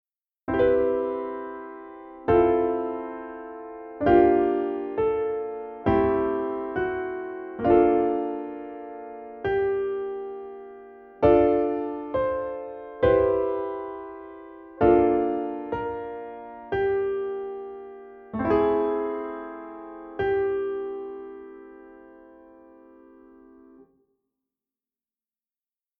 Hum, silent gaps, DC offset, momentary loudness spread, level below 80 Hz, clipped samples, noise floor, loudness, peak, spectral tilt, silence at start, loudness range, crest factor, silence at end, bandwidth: none; none; under 0.1%; 20 LU; -50 dBFS; under 0.1%; under -90 dBFS; -25 LUFS; -6 dBFS; -10 dB/octave; 0.5 s; 7 LU; 20 dB; 3.7 s; 4.5 kHz